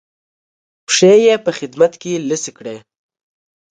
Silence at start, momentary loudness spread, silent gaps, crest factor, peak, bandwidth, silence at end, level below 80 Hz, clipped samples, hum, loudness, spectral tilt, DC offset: 0.9 s; 21 LU; none; 16 dB; 0 dBFS; 9.6 kHz; 1 s; -64 dBFS; under 0.1%; none; -14 LUFS; -3.5 dB/octave; under 0.1%